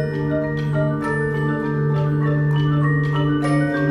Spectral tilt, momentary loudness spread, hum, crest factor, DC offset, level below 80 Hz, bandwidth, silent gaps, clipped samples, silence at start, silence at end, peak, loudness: -8.5 dB/octave; 3 LU; none; 10 dB; under 0.1%; -42 dBFS; 10.5 kHz; none; under 0.1%; 0 s; 0 s; -8 dBFS; -20 LUFS